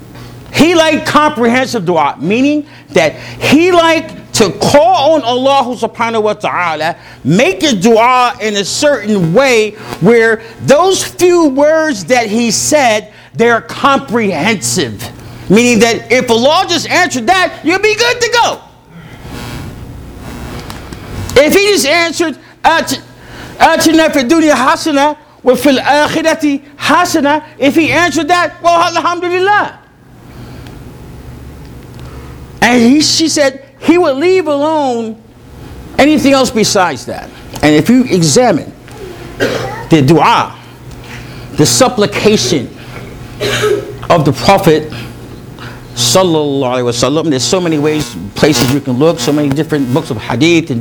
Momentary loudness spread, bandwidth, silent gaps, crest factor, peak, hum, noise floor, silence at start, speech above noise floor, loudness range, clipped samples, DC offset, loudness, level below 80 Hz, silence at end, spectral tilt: 20 LU; over 20 kHz; none; 12 dB; 0 dBFS; none; -37 dBFS; 0 s; 27 dB; 4 LU; 0.5%; under 0.1%; -10 LUFS; -38 dBFS; 0 s; -4 dB/octave